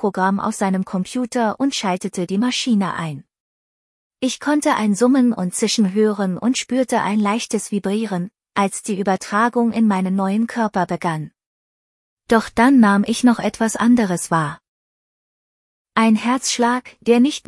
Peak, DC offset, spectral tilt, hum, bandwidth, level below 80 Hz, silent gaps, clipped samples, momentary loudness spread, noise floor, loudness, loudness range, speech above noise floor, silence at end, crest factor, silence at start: 0 dBFS; under 0.1%; -5 dB/octave; none; 12 kHz; -56 dBFS; 3.40-4.11 s, 11.46-12.17 s, 14.68-15.85 s; under 0.1%; 8 LU; under -90 dBFS; -19 LUFS; 4 LU; over 72 dB; 0.1 s; 18 dB; 0 s